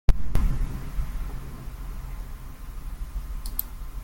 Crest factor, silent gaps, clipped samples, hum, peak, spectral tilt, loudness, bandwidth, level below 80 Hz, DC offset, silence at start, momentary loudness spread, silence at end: 22 dB; none; under 0.1%; none; -2 dBFS; -6 dB/octave; -34 LUFS; 17 kHz; -28 dBFS; under 0.1%; 0.1 s; 12 LU; 0 s